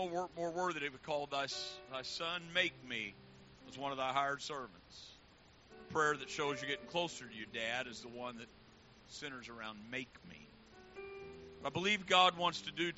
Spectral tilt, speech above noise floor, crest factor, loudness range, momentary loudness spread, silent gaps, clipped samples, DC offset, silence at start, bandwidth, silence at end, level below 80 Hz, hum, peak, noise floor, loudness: -1 dB/octave; 24 dB; 24 dB; 11 LU; 20 LU; none; under 0.1%; under 0.1%; 0 s; 8 kHz; 0 s; -72 dBFS; none; -16 dBFS; -64 dBFS; -38 LUFS